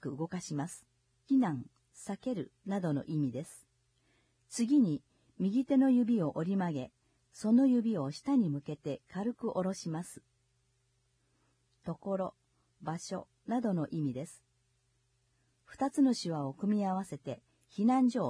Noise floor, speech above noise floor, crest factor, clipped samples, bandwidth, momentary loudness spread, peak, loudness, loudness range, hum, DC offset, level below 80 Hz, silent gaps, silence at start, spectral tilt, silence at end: -75 dBFS; 43 dB; 16 dB; under 0.1%; 11 kHz; 16 LU; -18 dBFS; -33 LUFS; 10 LU; none; under 0.1%; -74 dBFS; none; 0 s; -7 dB/octave; 0 s